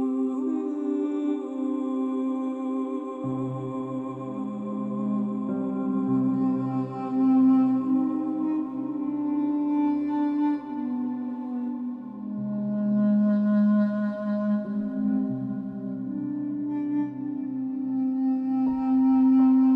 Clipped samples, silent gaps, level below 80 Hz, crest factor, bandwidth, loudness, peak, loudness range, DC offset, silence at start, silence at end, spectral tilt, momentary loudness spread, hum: under 0.1%; none; -68 dBFS; 12 dB; 3.7 kHz; -26 LUFS; -12 dBFS; 5 LU; under 0.1%; 0 s; 0 s; -10.5 dB/octave; 10 LU; none